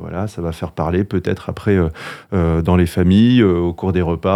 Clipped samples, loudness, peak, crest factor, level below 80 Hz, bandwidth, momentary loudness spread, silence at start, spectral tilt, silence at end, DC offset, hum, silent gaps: under 0.1%; -17 LUFS; 0 dBFS; 16 dB; -38 dBFS; 14 kHz; 12 LU; 0 s; -8 dB/octave; 0 s; under 0.1%; none; none